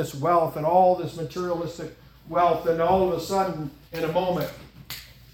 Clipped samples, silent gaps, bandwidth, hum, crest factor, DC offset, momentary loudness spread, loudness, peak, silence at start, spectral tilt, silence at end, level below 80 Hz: under 0.1%; none; 18 kHz; none; 18 dB; under 0.1%; 18 LU; -24 LUFS; -8 dBFS; 0 s; -6 dB/octave; 0.3 s; -52 dBFS